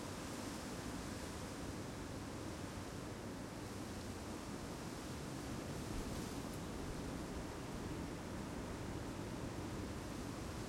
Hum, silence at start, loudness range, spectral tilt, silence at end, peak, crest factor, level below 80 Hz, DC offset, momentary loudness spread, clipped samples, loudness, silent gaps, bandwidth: none; 0 s; 1 LU; -5 dB/octave; 0 s; -32 dBFS; 14 dB; -56 dBFS; under 0.1%; 2 LU; under 0.1%; -47 LUFS; none; 16.5 kHz